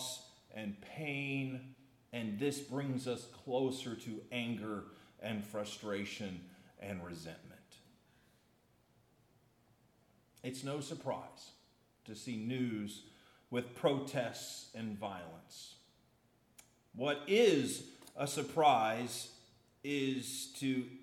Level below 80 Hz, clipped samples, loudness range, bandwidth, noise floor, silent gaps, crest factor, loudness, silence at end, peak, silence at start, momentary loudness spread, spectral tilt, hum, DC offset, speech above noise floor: -80 dBFS; under 0.1%; 15 LU; 17 kHz; -72 dBFS; none; 24 dB; -38 LUFS; 0 s; -16 dBFS; 0 s; 19 LU; -4.5 dB/octave; none; under 0.1%; 34 dB